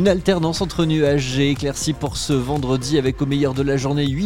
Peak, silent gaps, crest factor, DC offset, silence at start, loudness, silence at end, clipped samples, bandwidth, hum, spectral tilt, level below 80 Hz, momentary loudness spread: -4 dBFS; none; 14 dB; 0.5%; 0 s; -20 LUFS; 0 s; under 0.1%; 16 kHz; none; -5.5 dB/octave; -36 dBFS; 4 LU